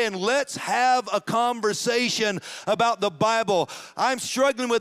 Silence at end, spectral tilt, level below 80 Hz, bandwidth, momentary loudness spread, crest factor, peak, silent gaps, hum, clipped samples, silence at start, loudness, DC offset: 0 s; -3 dB/octave; -70 dBFS; 16 kHz; 5 LU; 14 dB; -10 dBFS; none; none; under 0.1%; 0 s; -23 LUFS; under 0.1%